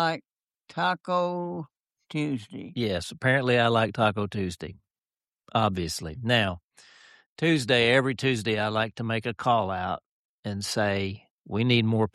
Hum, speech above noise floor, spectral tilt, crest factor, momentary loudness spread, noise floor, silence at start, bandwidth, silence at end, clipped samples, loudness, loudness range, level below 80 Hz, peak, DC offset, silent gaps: none; over 64 dB; -5.5 dB/octave; 18 dB; 15 LU; under -90 dBFS; 0 s; 13 kHz; 0.05 s; under 0.1%; -26 LUFS; 4 LU; -58 dBFS; -8 dBFS; under 0.1%; 0.30-0.34 s, 5.28-5.32 s, 6.64-6.69 s, 7.26-7.36 s, 10.06-10.43 s, 11.30-11.42 s